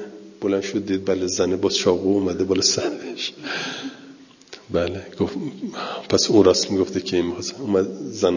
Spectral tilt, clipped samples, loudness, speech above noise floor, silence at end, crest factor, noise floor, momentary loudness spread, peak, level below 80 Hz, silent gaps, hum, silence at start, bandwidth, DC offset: -4 dB/octave; under 0.1%; -22 LUFS; 24 dB; 0 s; 20 dB; -45 dBFS; 12 LU; -2 dBFS; -48 dBFS; none; none; 0 s; 7.4 kHz; under 0.1%